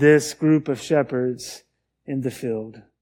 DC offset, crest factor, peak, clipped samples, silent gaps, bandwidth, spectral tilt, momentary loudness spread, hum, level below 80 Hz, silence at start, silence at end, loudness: under 0.1%; 18 dB; -2 dBFS; under 0.1%; none; 17 kHz; -6 dB/octave; 19 LU; none; -64 dBFS; 0 s; 0.2 s; -23 LUFS